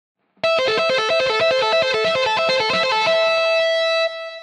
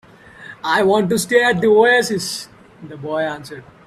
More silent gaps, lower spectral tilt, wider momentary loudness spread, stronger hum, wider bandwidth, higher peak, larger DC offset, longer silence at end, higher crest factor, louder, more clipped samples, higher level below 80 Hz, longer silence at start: neither; second, -2 dB/octave vs -4 dB/octave; second, 3 LU vs 19 LU; neither; second, 10.5 kHz vs 14.5 kHz; second, -8 dBFS vs 0 dBFS; neither; second, 0 s vs 0.25 s; second, 10 dB vs 18 dB; about the same, -17 LUFS vs -16 LUFS; neither; second, -62 dBFS vs -56 dBFS; about the same, 0.45 s vs 0.4 s